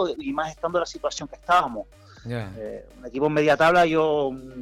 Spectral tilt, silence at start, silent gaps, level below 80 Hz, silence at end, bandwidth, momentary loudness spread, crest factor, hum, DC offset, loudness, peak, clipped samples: -5 dB/octave; 0 s; none; -52 dBFS; 0 s; 15.5 kHz; 19 LU; 14 dB; none; under 0.1%; -23 LUFS; -10 dBFS; under 0.1%